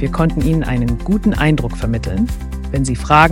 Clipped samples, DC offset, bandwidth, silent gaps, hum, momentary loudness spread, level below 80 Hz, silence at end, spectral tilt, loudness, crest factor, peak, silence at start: 0.2%; under 0.1%; 16.5 kHz; none; none; 7 LU; -24 dBFS; 0 s; -6.5 dB/octave; -17 LUFS; 16 dB; 0 dBFS; 0 s